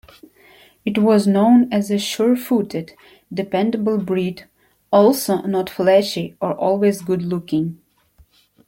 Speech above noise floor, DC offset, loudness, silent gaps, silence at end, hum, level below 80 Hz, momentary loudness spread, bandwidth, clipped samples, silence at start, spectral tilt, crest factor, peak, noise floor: 37 dB; under 0.1%; -18 LUFS; none; 0.95 s; none; -60 dBFS; 13 LU; 16.5 kHz; under 0.1%; 0.85 s; -6 dB/octave; 16 dB; -2 dBFS; -55 dBFS